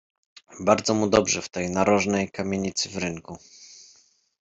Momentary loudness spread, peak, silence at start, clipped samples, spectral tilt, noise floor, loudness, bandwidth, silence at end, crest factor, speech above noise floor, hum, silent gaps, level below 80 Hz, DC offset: 22 LU; -4 dBFS; 0.5 s; under 0.1%; -4 dB/octave; -60 dBFS; -24 LUFS; 8.2 kHz; 0.6 s; 22 dB; 36 dB; none; none; -56 dBFS; under 0.1%